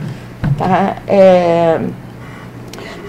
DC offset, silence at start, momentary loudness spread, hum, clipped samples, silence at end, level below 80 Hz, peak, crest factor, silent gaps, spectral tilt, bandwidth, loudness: under 0.1%; 0 s; 23 LU; none; 0.2%; 0 s; -38 dBFS; 0 dBFS; 14 dB; none; -7.5 dB/octave; 13 kHz; -12 LUFS